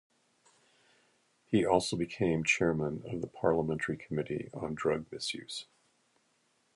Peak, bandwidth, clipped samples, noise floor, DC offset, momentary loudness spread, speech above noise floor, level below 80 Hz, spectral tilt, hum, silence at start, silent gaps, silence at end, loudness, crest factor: -12 dBFS; 11.5 kHz; under 0.1%; -73 dBFS; under 0.1%; 11 LU; 41 dB; -60 dBFS; -5 dB/octave; none; 1.5 s; none; 1.1 s; -32 LUFS; 22 dB